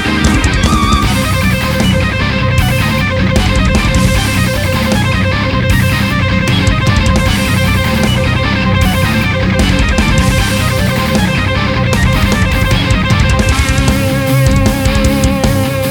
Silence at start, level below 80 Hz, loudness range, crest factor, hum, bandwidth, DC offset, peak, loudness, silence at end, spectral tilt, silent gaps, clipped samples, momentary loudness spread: 0 s; -18 dBFS; 0 LU; 10 dB; none; over 20 kHz; under 0.1%; 0 dBFS; -11 LUFS; 0 s; -5 dB/octave; none; under 0.1%; 2 LU